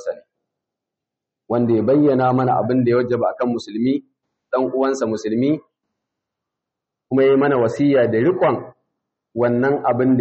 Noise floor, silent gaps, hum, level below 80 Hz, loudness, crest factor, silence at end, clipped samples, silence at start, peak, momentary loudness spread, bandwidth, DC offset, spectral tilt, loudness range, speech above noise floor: -84 dBFS; none; none; -62 dBFS; -18 LUFS; 12 dB; 0 s; under 0.1%; 0 s; -6 dBFS; 9 LU; 7.6 kHz; under 0.1%; -7 dB/octave; 5 LU; 67 dB